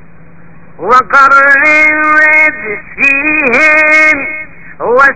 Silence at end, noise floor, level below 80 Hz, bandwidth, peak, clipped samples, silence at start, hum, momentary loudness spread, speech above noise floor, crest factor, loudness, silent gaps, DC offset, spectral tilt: 0 s; -37 dBFS; -44 dBFS; 8 kHz; 0 dBFS; 3%; 0.8 s; none; 15 LU; 30 dB; 8 dB; -5 LUFS; none; 3%; -4 dB/octave